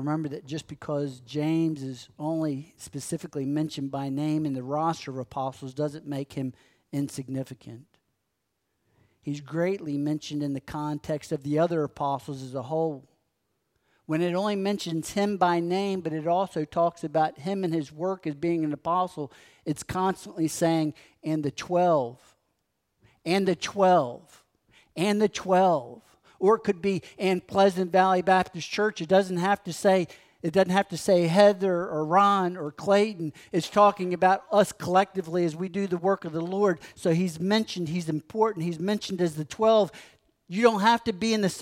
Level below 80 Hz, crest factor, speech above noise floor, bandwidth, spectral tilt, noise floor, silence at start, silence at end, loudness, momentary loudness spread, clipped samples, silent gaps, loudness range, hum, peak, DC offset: -64 dBFS; 20 dB; 53 dB; 16 kHz; -6 dB/octave; -79 dBFS; 0 s; 0 s; -26 LUFS; 13 LU; under 0.1%; none; 9 LU; none; -6 dBFS; under 0.1%